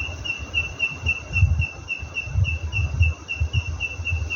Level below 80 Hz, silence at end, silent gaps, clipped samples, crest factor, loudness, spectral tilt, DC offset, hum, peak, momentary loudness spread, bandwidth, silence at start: -30 dBFS; 0 s; none; under 0.1%; 18 dB; -24 LUFS; -4.5 dB/octave; under 0.1%; none; -6 dBFS; 6 LU; 7 kHz; 0 s